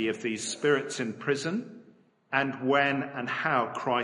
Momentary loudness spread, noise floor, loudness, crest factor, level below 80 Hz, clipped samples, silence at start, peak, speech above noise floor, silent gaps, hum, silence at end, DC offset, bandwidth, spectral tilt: 8 LU; -60 dBFS; -29 LUFS; 20 dB; -76 dBFS; under 0.1%; 0 s; -10 dBFS; 31 dB; none; none; 0 s; under 0.1%; 11.5 kHz; -4 dB/octave